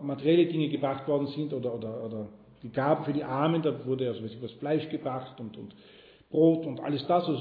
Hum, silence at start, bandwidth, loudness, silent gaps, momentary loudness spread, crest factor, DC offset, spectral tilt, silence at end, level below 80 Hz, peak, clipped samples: none; 0 s; 4.9 kHz; -29 LUFS; none; 16 LU; 18 dB; under 0.1%; -10.5 dB/octave; 0 s; -70 dBFS; -12 dBFS; under 0.1%